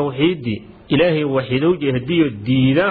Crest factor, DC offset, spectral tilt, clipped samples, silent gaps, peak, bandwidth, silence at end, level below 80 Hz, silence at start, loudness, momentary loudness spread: 14 dB; under 0.1%; -10.5 dB/octave; under 0.1%; none; -2 dBFS; 4.9 kHz; 0 s; -46 dBFS; 0 s; -18 LUFS; 7 LU